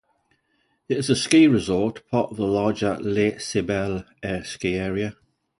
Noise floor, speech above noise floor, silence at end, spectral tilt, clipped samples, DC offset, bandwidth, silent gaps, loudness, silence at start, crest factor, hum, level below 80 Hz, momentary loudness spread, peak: -69 dBFS; 47 dB; 0.45 s; -5.5 dB/octave; under 0.1%; under 0.1%; 11.5 kHz; none; -23 LUFS; 0.9 s; 18 dB; none; -50 dBFS; 13 LU; -4 dBFS